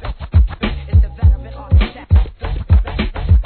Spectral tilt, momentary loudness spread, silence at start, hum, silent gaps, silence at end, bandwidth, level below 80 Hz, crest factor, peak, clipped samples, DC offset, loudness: -11 dB/octave; 8 LU; 0 s; none; none; 0 s; 4.5 kHz; -16 dBFS; 12 dB; -2 dBFS; under 0.1%; under 0.1%; -17 LUFS